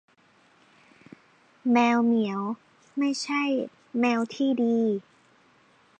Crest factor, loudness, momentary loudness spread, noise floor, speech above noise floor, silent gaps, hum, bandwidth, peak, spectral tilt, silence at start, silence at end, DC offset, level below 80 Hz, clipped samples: 18 dB; -26 LUFS; 12 LU; -61 dBFS; 37 dB; none; none; 9.2 kHz; -10 dBFS; -5 dB/octave; 1.65 s; 1 s; under 0.1%; -82 dBFS; under 0.1%